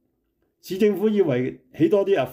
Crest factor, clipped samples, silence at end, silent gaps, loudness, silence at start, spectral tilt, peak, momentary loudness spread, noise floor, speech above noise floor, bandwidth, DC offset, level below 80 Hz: 14 dB; under 0.1%; 0 s; none; -21 LUFS; 0.65 s; -7.5 dB/octave; -8 dBFS; 9 LU; -71 dBFS; 50 dB; 16 kHz; under 0.1%; -64 dBFS